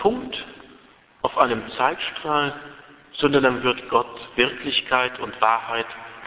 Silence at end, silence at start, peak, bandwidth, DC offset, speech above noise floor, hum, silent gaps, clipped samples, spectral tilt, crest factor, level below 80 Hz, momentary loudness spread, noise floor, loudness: 0 s; 0 s; -2 dBFS; 4 kHz; under 0.1%; 30 dB; none; none; under 0.1%; -8.5 dB/octave; 22 dB; -56 dBFS; 13 LU; -52 dBFS; -22 LUFS